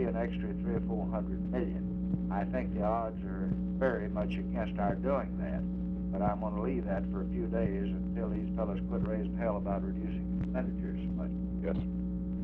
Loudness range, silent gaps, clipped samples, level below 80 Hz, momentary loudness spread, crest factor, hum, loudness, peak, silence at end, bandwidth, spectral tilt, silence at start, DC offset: 1 LU; none; under 0.1%; -42 dBFS; 4 LU; 16 dB; none; -34 LUFS; -16 dBFS; 0 s; 3.8 kHz; -11 dB/octave; 0 s; under 0.1%